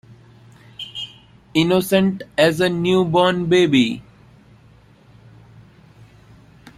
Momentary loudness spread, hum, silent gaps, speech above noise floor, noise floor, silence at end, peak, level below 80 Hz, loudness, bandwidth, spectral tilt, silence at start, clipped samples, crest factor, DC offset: 16 LU; none; none; 33 dB; -50 dBFS; 2.8 s; -2 dBFS; -54 dBFS; -17 LUFS; 16 kHz; -5.5 dB/octave; 0.8 s; under 0.1%; 18 dB; under 0.1%